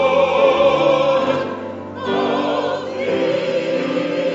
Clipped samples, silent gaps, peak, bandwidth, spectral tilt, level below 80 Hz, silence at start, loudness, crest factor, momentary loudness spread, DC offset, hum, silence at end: under 0.1%; none; -2 dBFS; 7.8 kHz; -5.5 dB/octave; -54 dBFS; 0 s; -18 LUFS; 14 dB; 9 LU; under 0.1%; none; 0 s